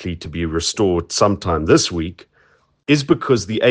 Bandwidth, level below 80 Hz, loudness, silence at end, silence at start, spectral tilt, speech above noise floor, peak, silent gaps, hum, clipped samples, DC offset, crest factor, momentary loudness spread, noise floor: 10 kHz; -42 dBFS; -18 LUFS; 0 s; 0 s; -4.5 dB/octave; 40 dB; 0 dBFS; none; none; under 0.1%; under 0.1%; 18 dB; 11 LU; -57 dBFS